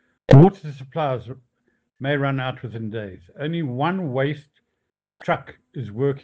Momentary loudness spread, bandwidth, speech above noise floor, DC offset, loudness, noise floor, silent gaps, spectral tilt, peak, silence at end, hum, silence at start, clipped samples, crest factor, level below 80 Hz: 22 LU; 6.8 kHz; 58 dB; under 0.1%; -21 LUFS; -79 dBFS; none; -9 dB/octave; -4 dBFS; 0.05 s; none; 0.3 s; under 0.1%; 18 dB; -48 dBFS